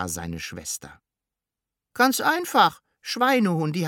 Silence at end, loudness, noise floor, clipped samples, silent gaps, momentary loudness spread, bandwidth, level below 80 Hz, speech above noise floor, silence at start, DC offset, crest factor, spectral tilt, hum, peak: 0 s; -23 LUFS; -88 dBFS; under 0.1%; none; 13 LU; 19 kHz; -56 dBFS; 65 dB; 0 s; under 0.1%; 20 dB; -4 dB/octave; none; -4 dBFS